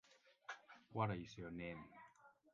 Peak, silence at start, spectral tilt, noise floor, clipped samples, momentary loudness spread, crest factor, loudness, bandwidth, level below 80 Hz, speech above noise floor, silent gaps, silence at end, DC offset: -26 dBFS; 0.05 s; -5.5 dB/octave; -69 dBFS; under 0.1%; 18 LU; 24 dB; -49 LUFS; 7.2 kHz; -72 dBFS; 22 dB; none; 0.2 s; under 0.1%